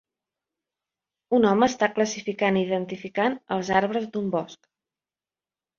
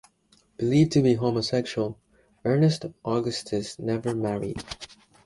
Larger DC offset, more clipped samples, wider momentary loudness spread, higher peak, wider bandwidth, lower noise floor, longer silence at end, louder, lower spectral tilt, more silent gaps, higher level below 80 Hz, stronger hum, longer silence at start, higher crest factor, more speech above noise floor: neither; neither; second, 8 LU vs 12 LU; about the same, -6 dBFS vs -8 dBFS; second, 7.4 kHz vs 11.5 kHz; first, under -90 dBFS vs -63 dBFS; first, 1.25 s vs 0.4 s; about the same, -24 LUFS vs -26 LUFS; second, -5 dB/octave vs -6.5 dB/octave; neither; second, -64 dBFS vs -56 dBFS; neither; first, 1.3 s vs 0.6 s; about the same, 20 dB vs 18 dB; first, over 66 dB vs 38 dB